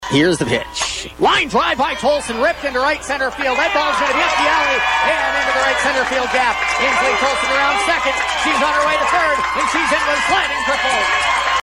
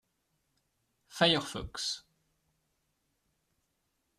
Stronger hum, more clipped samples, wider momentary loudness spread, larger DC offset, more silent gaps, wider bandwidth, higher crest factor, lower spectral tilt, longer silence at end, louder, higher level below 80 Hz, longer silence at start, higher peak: neither; neither; second, 4 LU vs 15 LU; neither; neither; first, 16.5 kHz vs 14 kHz; second, 12 dB vs 28 dB; about the same, -2.5 dB/octave vs -3.5 dB/octave; second, 0 s vs 2.2 s; first, -15 LUFS vs -30 LUFS; first, -42 dBFS vs -62 dBFS; second, 0 s vs 1.1 s; first, -4 dBFS vs -10 dBFS